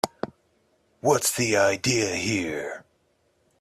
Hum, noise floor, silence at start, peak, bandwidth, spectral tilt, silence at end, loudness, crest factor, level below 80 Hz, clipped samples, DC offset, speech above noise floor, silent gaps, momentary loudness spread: none; -68 dBFS; 0.05 s; -4 dBFS; 15.5 kHz; -3.5 dB/octave; 0.8 s; -24 LUFS; 22 dB; -62 dBFS; under 0.1%; under 0.1%; 44 dB; none; 16 LU